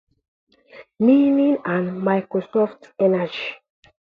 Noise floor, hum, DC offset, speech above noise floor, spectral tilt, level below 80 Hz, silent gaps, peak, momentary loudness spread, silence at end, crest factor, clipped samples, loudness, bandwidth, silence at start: -47 dBFS; none; under 0.1%; 28 dB; -9 dB/octave; -68 dBFS; none; -4 dBFS; 10 LU; 0.6 s; 16 dB; under 0.1%; -20 LUFS; 5.2 kHz; 0.75 s